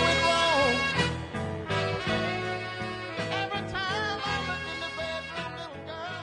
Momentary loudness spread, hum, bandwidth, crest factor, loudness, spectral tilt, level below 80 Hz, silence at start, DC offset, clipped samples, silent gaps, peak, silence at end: 13 LU; none; 11 kHz; 18 dB; -29 LUFS; -4 dB/octave; -52 dBFS; 0 s; under 0.1%; under 0.1%; none; -12 dBFS; 0 s